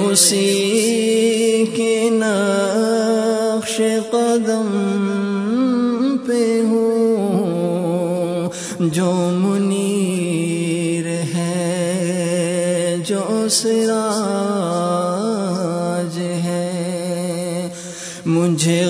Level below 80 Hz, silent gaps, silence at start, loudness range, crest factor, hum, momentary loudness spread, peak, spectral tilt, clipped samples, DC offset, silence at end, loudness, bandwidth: -64 dBFS; none; 0 s; 4 LU; 18 dB; none; 6 LU; 0 dBFS; -4.5 dB/octave; under 0.1%; under 0.1%; 0 s; -18 LUFS; 11 kHz